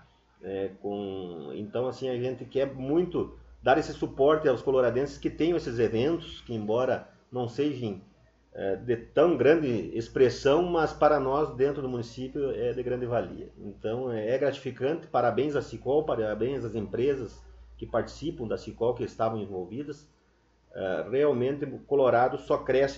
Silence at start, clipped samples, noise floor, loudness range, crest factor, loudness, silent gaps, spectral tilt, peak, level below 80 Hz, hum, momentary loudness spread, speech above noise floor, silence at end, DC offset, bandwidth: 0.45 s; under 0.1%; -65 dBFS; 6 LU; 20 dB; -28 LUFS; none; -7 dB/octave; -8 dBFS; -54 dBFS; none; 13 LU; 38 dB; 0 s; under 0.1%; 7.8 kHz